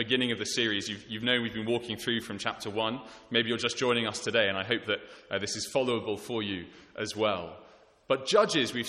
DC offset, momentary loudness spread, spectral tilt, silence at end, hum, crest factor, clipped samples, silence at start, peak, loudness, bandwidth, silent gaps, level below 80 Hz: under 0.1%; 9 LU; -3.5 dB/octave; 0 s; none; 22 dB; under 0.1%; 0 s; -10 dBFS; -30 LUFS; 13.5 kHz; none; -66 dBFS